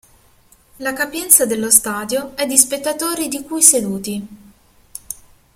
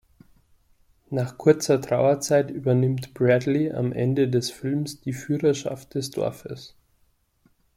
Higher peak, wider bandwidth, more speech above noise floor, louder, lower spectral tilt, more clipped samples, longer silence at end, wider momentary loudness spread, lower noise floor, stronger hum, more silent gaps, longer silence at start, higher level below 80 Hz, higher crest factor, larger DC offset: first, 0 dBFS vs -4 dBFS; about the same, 16.5 kHz vs 15.5 kHz; second, 35 dB vs 42 dB; first, -14 LUFS vs -24 LUFS; second, -1.5 dB/octave vs -6 dB/octave; first, 0.1% vs under 0.1%; second, 0.4 s vs 1.1 s; first, 20 LU vs 10 LU; second, -52 dBFS vs -65 dBFS; neither; neither; second, 0.8 s vs 1.1 s; first, -54 dBFS vs -60 dBFS; about the same, 18 dB vs 20 dB; neither